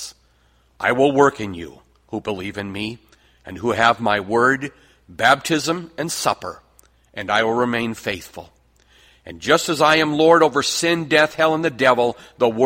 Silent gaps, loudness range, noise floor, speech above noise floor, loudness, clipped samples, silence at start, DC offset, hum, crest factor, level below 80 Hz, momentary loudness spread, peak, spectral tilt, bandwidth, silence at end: none; 7 LU; -58 dBFS; 39 dB; -18 LUFS; under 0.1%; 0 s; under 0.1%; none; 20 dB; -54 dBFS; 16 LU; 0 dBFS; -4 dB/octave; 16.5 kHz; 0 s